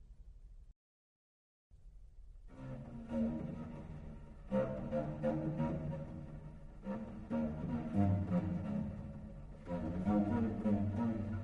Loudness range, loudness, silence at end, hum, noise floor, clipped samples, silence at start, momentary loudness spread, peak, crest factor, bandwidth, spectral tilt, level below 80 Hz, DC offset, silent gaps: 8 LU; -39 LUFS; 0 s; none; under -90 dBFS; under 0.1%; 0 s; 16 LU; -22 dBFS; 18 dB; 7 kHz; -10 dB/octave; -54 dBFS; under 0.1%; 0.76-1.70 s